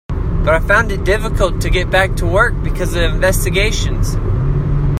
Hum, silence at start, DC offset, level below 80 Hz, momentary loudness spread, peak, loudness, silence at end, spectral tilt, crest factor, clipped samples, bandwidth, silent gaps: none; 0.1 s; under 0.1%; -18 dBFS; 5 LU; 0 dBFS; -15 LUFS; 0 s; -5 dB/octave; 14 dB; under 0.1%; 15.5 kHz; none